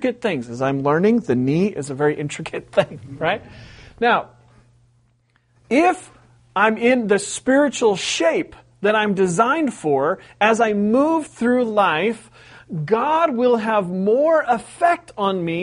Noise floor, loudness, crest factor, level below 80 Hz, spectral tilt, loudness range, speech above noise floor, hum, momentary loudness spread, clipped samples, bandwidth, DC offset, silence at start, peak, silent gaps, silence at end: -61 dBFS; -19 LUFS; 18 dB; -58 dBFS; -5 dB/octave; 5 LU; 43 dB; none; 7 LU; under 0.1%; 10.5 kHz; under 0.1%; 0 s; -2 dBFS; none; 0 s